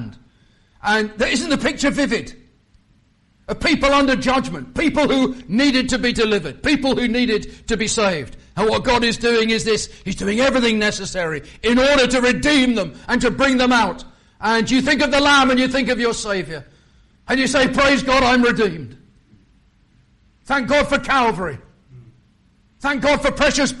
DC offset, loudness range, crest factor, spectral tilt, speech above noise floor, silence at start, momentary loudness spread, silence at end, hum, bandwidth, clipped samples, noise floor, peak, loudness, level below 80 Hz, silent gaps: under 0.1%; 5 LU; 14 dB; -3.5 dB/octave; 40 dB; 0 s; 10 LU; 0 s; none; 11.5 kHz; under 0.1%; -57 dBFS; -4 dBFS; -17 LUFS; -38 dBFS; none